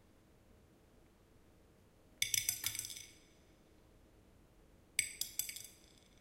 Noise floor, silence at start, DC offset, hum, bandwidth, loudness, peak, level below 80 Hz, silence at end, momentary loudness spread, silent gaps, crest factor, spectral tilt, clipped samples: -66 dBFS; 1.55 s; under 0.1%; none; 16.5 kHz; -39 LUFS; -14 dBFS; -70 dBFS; 0.25 s; 19 LU; none; 32 dB; 1 dB/octave; under 0.1%